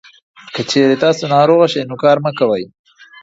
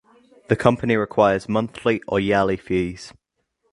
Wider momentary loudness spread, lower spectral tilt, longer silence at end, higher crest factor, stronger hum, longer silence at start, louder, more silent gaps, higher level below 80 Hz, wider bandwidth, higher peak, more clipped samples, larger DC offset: first, 12 LU vs 7 LU; second, -5.5 dB/octave vs -7 dB/octave; about the same, 0.55 s vs 0.6 s; second, 14 dB vs 22 dB; neither; about the same, 0.45 s vs 0.5 s; first, -14 LUFS vs -21 LUFS; neither; second, -60 dBFS vs -48 dBFS; second, 8 kHz vs 11.5 kHz; about the same, 0 dBFS vs 0 dBFS; neither; neither